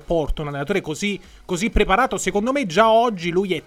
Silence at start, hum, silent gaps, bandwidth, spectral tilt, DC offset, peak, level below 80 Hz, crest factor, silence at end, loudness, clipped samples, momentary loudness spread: 0.1 s; none; none; 16 kHz; -4.5 dB/octave; under 0.1%; -2 dBFS; -32 dBFS; 18 dB; 0.05 s; -20 LUFS; under 0.1%; 11 LU